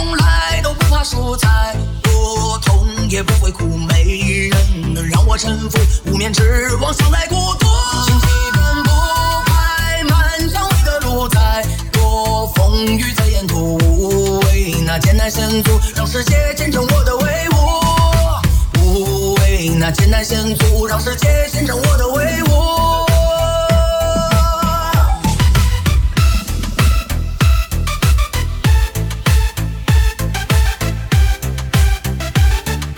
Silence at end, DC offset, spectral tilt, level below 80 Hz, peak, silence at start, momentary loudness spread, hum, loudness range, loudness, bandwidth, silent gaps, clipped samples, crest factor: 0 s; under 0.1%; -5 dB/octave; -16 dBFS; 0 dBFS; 0 s; 4 LU; none; 2 LU; -15 LUFS; 20 kHz; none; under 0.1%; 12 dB